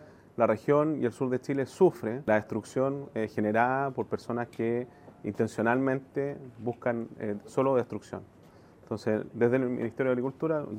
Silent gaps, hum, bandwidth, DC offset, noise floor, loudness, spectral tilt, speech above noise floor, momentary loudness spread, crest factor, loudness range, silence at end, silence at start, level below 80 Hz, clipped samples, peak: none; none; 15 kHz; under 0.1%; -55 dBFS; -30 LUFS; -7.5 dB/octave; 26 dB; 12 LU; 20 dB; 3 LU; 0 s; 0 s; -68 dBFS; under 0.1%; -10 dBFS